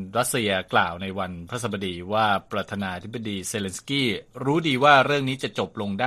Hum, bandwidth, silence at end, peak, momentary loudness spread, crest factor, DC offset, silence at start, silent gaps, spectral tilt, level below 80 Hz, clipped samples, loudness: none; 15 kHz; 0 s; -2 dBFS; 13 LU; 24 dB; under 0.1%; 0 s; none; -4 dB/octave; -58 dBFS; under 0.1%; -24 LUFS